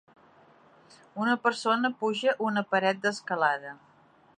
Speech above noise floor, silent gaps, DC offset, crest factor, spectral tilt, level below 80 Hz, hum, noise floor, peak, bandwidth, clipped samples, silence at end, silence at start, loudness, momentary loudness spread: 31 dB; none; under 0.1%; 20 dB; -4.5 dB/octave; -82 dBFS; none; -58 dBFS; -10 dBFS; 11 kHz; under 0.1%; 0.65 s; 1.15 s; -27 LUFS; 6 LU